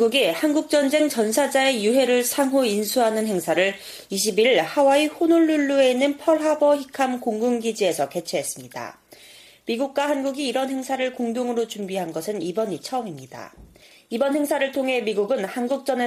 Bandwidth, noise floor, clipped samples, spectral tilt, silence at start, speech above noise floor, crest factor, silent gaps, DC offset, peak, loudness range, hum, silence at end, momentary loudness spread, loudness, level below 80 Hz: 15.5 kHz; -48 dBFS; under 0.1%; -3.5 dB/octave; 0 s; 27 dB; 16 dB; none; under 0.1%; -6 dBFS; 7 LU; none; 0 s; 11 LU; -22 LUFS; -66 dBFS